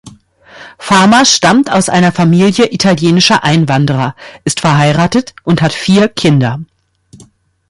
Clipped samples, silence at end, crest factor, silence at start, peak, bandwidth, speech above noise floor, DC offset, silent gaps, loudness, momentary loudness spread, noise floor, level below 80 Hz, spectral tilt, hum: under 0.1%; 0.55 s; 10 dB; 0.05 s; 0 dBFS; 11.5 kHz; 34 dB; under 0.1%; none; -9 LUFS; 9 LU; -43 dBFS; -44 dBFS; -4.5 dB/octave; none